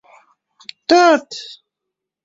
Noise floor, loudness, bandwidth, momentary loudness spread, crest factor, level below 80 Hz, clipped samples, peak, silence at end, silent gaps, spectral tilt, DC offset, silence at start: -81 dBFS; -13 LUFS; 7.8 kHz; 25 LU; 18 dB; -64 dBFS; under 0.1%; -2 dBFS; 0.8 s; none; -2 dB/octave; under 0.1%; 0.9 s